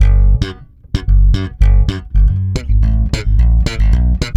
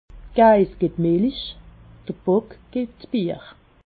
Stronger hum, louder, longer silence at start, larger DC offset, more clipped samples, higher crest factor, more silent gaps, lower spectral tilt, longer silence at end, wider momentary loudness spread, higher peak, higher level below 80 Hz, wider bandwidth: neither; first, -15 LUFS vs -21 LUFS; second, 0 s vs 0.15 s; neither; neither; second, 10 dB vs 18 dB; neither; second, -6.5 dB/octave vs -11 dB/octave; second, 0 s vs 0.35 s; second, 5 LU vs 19 LU; first, 0 dBFS vs -4 dBFS; first, -12 dBFS vs -46 dBFS; first, 8 kHz vs 4.8 kHz